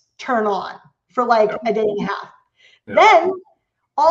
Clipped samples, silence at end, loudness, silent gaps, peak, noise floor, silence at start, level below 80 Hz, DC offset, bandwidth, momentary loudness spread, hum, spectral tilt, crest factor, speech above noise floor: under 0.1%; 0 s; -17 LUFS; none; 0 dBFS; -55 dBFS; 0.2 s; -64 dBFS; under 0.1%; 7.8 kHz; 17 LU; none; -4.5 dB/octave; 18 dB; 38 dB